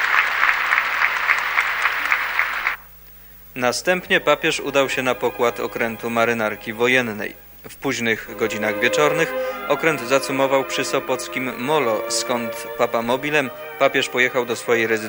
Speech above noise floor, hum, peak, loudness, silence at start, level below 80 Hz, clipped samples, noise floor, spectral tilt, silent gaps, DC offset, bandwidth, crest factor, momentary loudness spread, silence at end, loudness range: 22 dB; none; 0 dBFS; -20 LUFS; 0 s; -54 dBFS; under 0.1%; -43 dBFS; -3 dB/octave; none; under 0.1%; 16.5 kHz; 20 dB; 7 LU; 0 s; 2 LU